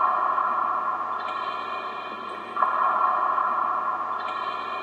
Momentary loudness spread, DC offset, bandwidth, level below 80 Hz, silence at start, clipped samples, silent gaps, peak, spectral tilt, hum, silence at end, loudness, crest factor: 10 LU; under 0.1%; 8.6 kHz; -86 dBFS; 0 s; under 0.1%; none; -8 dBFS; -4 dB/octave; none; 0 s; -26 LUFS; 18 dB